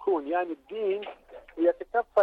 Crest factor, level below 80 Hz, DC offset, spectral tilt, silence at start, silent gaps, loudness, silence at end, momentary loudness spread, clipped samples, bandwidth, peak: 16 dB; -64 dBFS; under 0.1%; -6.5 dB/octave; 0 s; none; -29 LUFS; 0 s; 16 LU; under 0.1%; 4.5 kHz; -12 dBFS